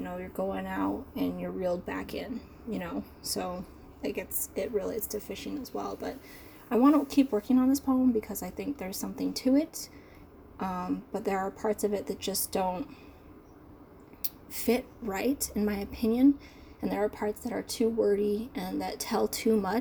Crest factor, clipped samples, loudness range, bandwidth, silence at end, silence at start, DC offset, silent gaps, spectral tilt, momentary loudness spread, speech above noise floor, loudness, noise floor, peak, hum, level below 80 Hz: 24 dB; under 0.1%; 7 LU; over 20 kHz; 0 s; 0 s; under 0.1%; none; -5 dB/octave; 13 LU; 22 dB; -31 LUFS; -52 dBFS; -6 dBFS; none; -54 dBFS